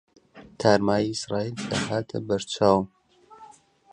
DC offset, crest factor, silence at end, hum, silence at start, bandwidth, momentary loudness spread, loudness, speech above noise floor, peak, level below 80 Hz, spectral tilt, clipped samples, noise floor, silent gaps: under 0.1%; 24 dB; 0.45 s; none; 0.35 s; 11 kHz; 8 LU; -25 LUFS; 27 dB; -4 dBFS; -56 dBFS; -5 dB/octave; under 0.1%; -51 dBFS; none